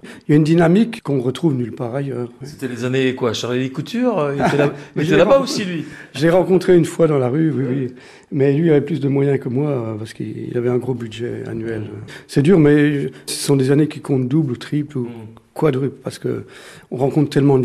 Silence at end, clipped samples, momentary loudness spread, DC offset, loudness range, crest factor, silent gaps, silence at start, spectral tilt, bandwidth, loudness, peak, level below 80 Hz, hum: 0 s; under 0.1%; 14 LU; under 0.1%; 5 LU; 14 dB; none; 0.05 s; -7 dB/octave; 14 kHz; -18 LUFS; -4 dBFS; -52 dBFS; none